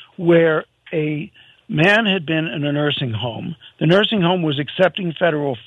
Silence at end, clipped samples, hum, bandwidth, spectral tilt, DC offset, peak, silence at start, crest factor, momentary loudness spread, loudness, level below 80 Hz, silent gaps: 0.05 s; under 0.1%; none; 8.8 kHz; -7 dB/octave; under 0.1%; -2 dBFS; 0 s; 16 dB; 12 LU; -18 LUFS; -62 dBFS; none